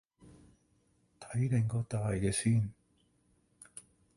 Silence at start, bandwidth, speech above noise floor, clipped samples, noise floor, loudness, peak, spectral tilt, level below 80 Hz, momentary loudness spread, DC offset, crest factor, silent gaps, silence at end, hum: 0.25 s; 11.5 kHz; 41 dB; under 0.1%; -72 dBFS; -33 LUFS; -18 dBFS; -6 dB/octave; -56 dBFS; 21 LU; under 0.1%; 18 dB; none; 0.35 s; none